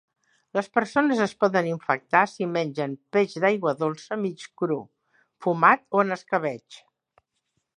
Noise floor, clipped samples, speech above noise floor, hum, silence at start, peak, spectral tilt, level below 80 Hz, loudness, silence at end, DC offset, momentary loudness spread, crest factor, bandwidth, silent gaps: -77 dBFS; under 0.1%; 53 dB; none; 0.55 s; -4 dBFS; -6 dB/octave; -74 dBFS; -24 LUFS; 1 s; under 0.1%; 11 LU; 22 dB; 11 kHz; none